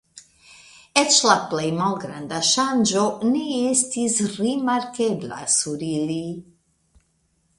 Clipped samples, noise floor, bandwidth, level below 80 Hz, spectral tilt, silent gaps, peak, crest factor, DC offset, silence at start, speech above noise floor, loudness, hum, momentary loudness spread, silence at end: under 0.1%; -67 dBFS; 11.5 kHz; -62 dBFS; -3 dB/octave; none; 0 dBFS; 22 dB; under 0.1%; 0.15 s; 45 dB; -21 LUFS; none; 11 LU; 1.15 s